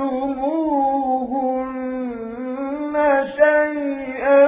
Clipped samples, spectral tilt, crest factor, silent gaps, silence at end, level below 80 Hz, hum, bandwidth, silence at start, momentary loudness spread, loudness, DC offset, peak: under 0.1%; -9 dB/octave; 16 dB; none; 0 s; -52 dBFS; none; 3.9 kHz; 0 s; 11 LU; -21 LUFS; under 0.1%; -4 dBFS